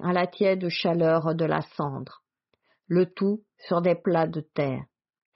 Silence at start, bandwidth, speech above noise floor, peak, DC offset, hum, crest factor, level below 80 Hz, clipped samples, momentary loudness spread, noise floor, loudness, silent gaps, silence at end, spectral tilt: 0 s; 5.8 kHz; 47 dB; -10 dBFS; under 0.1%; none; 16 dB; -66 dBFS; under 0.1%; 9 LU; -72 dBFS; -26 LUFS; none; 0.5 s; -5.5 dB/octave